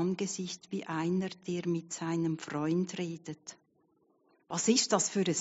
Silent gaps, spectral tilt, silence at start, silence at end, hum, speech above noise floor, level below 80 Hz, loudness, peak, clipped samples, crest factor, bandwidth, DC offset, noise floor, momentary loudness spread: none; -5 dB/octave; 0 s; 0 s; none; 38 dB; -76 dBFS; -32 LUFS; -12 dBFS; under 0.1%; 22 dB; 8 kHz; under 0.1%; -71 dBFS; 12 LU